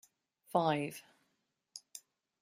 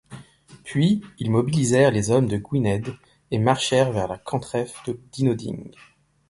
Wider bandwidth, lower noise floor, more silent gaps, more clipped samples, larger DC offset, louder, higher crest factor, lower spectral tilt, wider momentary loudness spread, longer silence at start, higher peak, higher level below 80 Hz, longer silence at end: first, 16 kHz vs 11.5 kHz; first, -82 dBFS vs -48 dBFS; neither; neither; neither; second, -35 LUFS vs -22 LUFS; first, 24 dB vs 18 dB; about the same, -5 dB/octave vs -6 dB/octave; first, 21 LU vs 14 LU; first, 0.55 s vs 0.1 s; second, -16 dBFS vs -4 dBFS; second, -82 dBFS vs -52 dBFS; second, 0.45 s vs 0.6 s